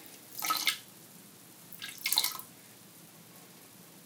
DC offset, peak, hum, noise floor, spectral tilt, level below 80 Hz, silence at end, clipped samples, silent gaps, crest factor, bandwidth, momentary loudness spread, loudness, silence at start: under 0.1%; -8 dBFS; none; -54 dBFS; 0.5 dB/octave; -88 dBFS; 0 s; under 0.1%; none; 30 dB; 19 kHz; 23 LU; -32 LUFS; 0 s